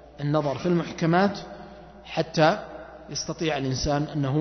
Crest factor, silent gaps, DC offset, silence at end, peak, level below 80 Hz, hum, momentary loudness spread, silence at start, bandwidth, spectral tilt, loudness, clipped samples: 20 dB; none; under 0.1%; 0 s; -6 dBFS; -48 dBFS; none; 19 LU; 0.05 s; 6.4 kHz; -5.5 dB/octave; -25 LUFS; under 0.1%